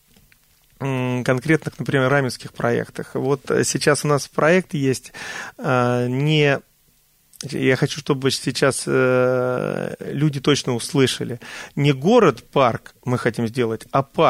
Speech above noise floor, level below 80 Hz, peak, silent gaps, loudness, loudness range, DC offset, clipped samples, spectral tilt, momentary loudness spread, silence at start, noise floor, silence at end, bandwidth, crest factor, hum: 39 dB; -56 dBFS; -4 dBFS; none; -20 LUFS; 2 LU; under 0.1%; under 0.1%; -5 dB/octave; 10 LU; 0.8 s; -59 dBFS; 0 s; 16 kHz; 18 dB; none